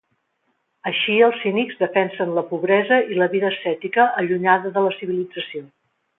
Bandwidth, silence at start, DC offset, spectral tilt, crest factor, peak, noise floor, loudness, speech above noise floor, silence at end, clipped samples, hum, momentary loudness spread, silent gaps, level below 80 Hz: 4 kHz; 0.85 s; under 0.1%; -9.5 dB/octave; 18 dB; -2 dBFS; -70 dBFS; -20 LUFS; 51 dB; 0.5 s; under 0.1%; none; 9 LU; none; -72 dBFS